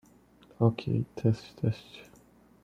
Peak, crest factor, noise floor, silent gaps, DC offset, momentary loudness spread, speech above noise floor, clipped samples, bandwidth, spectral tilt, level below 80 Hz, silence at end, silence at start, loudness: -10 dBFS; 22 dB; -59 dBFS; none; under 0.1%; 16 LU; 30 dB; under 0.1%; 7.4 kHz; -8.5 dB/octave; -62 dBFS; 0.6 s; 0.6 s; -31 LUFS